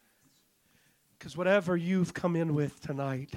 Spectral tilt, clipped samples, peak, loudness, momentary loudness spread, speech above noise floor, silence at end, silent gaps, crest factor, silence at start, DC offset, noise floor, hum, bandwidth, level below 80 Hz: -7 dB/octave; under 0.1%; -14 dBFS; -30 LUFS; 9 LU; 38 dB; 0 s; none; 18 dB; 1.2 s; under 0.1%; -68 dBFS; none; 14.5 kHz; -68 dBFS